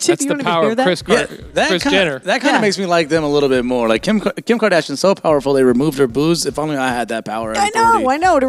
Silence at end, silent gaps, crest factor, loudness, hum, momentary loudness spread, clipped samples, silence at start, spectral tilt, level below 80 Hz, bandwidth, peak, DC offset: 0 s; none; 16 dB; -15 LUFS; none; 5 LU; under 0.1%; 0 s; -4.5 dB/octave; -44 dBFS; 15 kHz; 0 dBFS; under 0.1%